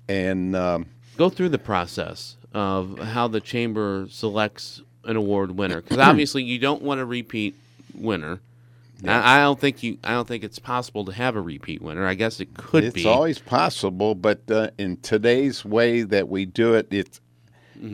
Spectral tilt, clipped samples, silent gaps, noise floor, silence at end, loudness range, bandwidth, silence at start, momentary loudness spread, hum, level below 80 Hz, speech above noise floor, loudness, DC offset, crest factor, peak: -5.5 dB/octave; under 0.1%; none; -55 dBFS; 0 s; 4 LU; 16 kHz; 0.1 s; 13 LU; none; -56 dBFS; 32 dB; -22 LUFS; under 0.1%; 22 dB; 0 dBFS